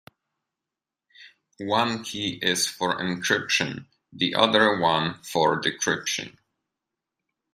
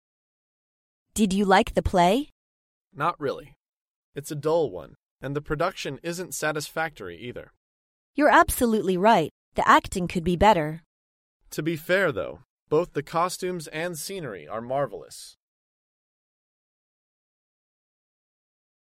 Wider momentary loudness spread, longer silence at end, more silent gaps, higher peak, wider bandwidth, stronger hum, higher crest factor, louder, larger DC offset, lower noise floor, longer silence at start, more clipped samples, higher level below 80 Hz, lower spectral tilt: second, 10 LU vs 19 LU; second, 1.25 s vs 3.7 s; second, none vs 2.32-2.85 s, 3.56-3.60 s, 3.69-4.13 s, 5.05-5.16 s, 7.57-8.14 s, 9.31-9.52 s, 10.86-11.40 s, 12.50-12.66 s; about the same, -4 dBFS vs -2 dBFS; about the same, 15.5 kHz vs 16 kHz; neither; about the same, 24 dB vs 24 dB; about the same, -24 LUFS vs -24 LUFS; neither; about the same, -88 dBFS vs under -90 dBFS; about the same, 1.2 s vs 1.15 s; neither; second, -66 dBFS vs -46 dBFS; second, -3 dB/octave vs -5 dB/octave